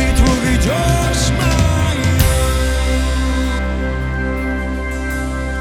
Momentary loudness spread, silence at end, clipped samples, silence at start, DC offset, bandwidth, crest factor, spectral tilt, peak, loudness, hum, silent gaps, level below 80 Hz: 7 LU; 0 s; under 0.1%; 0 s; under 0.1%; 17.5 kHz; 16 dB; -5 dB/octave; 0 dBFS; -17 LUFS; none; none; -18 dBFS